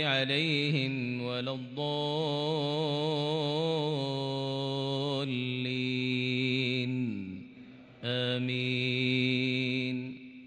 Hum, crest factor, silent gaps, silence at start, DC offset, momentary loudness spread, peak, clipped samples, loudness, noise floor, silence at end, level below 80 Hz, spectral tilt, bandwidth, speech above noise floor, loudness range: none; 16 dB; none; 0 s; under 0.1%; 7 LU; -14 dBFS; under 0.1%; -31 LUFS; -51 dBFS; 0 s; -76 dBFS; -6.5 dB/octave; 9.6 kHz; 20 dB; 1 LU